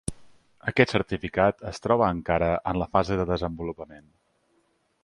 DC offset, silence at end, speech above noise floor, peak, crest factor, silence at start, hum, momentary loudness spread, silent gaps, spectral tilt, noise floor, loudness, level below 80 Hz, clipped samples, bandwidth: under 0.1%; 1.05 s; 44 dB; -2 dBFS; 26 dB; 0.1 s; none; 12 LU; none; -6 dB/octave; -69 dBFS; -25 LUFS; -44 dBFS; under 0.1%; 11.5 kHz